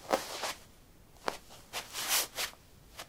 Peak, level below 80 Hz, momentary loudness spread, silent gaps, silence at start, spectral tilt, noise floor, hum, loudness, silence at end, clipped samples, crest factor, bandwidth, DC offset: -10 dBFS; -62 dBFS; 16 LU; none; 0 s; -0.5 dB/octave; -58 dBFS; none; -35 LUFS; 0 s; under 0.1%; 28 dB; 16.5 kHz; under 0.1%